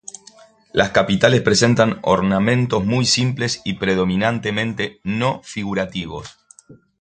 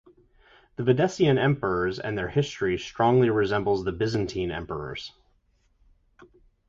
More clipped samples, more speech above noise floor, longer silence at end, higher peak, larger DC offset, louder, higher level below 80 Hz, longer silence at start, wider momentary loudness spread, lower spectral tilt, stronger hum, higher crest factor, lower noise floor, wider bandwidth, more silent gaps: neither; second, 30 dB vs 42 dB; second, 0.25 s vs 1.6 s; first, 0 dBFS vs -8 dBFS; neither; first, -18 LUFS vs -25 LUFS; about the same, -46 dBFS vs -50 dBFS; about the same, 0.75 s vs 0.8 s; about the same, 10 LU vs 12 LU; second, -5 dB/octave vs -6.5 dB/octave; neither; about the same, 18 dB vs 18 dB; second, -48 dBFS vs -66 dBFS; first, 9.4 kHz vs 7.6 kHz; neither